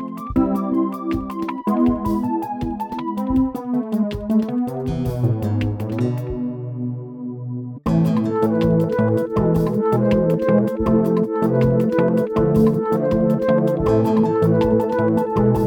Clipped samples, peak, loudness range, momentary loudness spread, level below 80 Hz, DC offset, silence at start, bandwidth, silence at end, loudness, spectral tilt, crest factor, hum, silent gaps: under 0.1%; -4 dBFS; 5 LU; 9 LU; -38 dBFS; under 0.1%; 0 s; 18 kHz; 0 s; -20 LUFS; -9.5 dB/octave; 14 dB; none; none